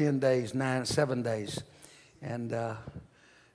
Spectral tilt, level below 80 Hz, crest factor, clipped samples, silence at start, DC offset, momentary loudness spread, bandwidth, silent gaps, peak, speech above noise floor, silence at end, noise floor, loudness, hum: -5.5 dB/octave; -62 dBFS; 18 dB; under 0.1%; 0 s; under 0.1%; 18 LU; 11 kHz; none; -14 dBFS; 29 dB; 0.5 s; -60 dBFS; -32 LUFS; none